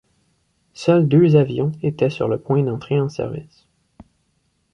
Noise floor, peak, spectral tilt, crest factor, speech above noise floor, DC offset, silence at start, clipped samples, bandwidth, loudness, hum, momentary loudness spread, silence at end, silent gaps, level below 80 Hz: -67 dBFS; -2 dBFS; -8.5 dB/octave; 18 dB; 49 dB; under 0.1%; 0.8 s; under 0.1%; 7.8 kHz; -19 LUFS; none; 12 LU; 1.3 s; none; -54 dBFS